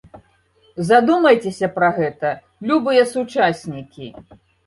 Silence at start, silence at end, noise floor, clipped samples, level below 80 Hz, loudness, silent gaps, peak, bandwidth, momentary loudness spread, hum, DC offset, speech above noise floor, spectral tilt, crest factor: 0.15 s; 0.45 s; -57 dBFS; under 0.1%; -58 dBFS; -17 LUFS; none; -2 dBFS; 11.5 kHz; 20 LU; none; under 0.1%; 40 dB; -5.5 dB/octave; 18 dB